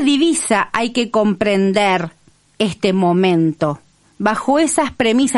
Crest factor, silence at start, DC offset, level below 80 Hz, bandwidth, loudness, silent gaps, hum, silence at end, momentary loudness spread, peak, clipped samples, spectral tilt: 14 dB; 0 s; under 0.1%; -52 dBFS; 11.5 kHz; -16 LUFS; none; none; 0 s; 7 LU; -2 dBFS; under 0.1%; -4.5 dB/octave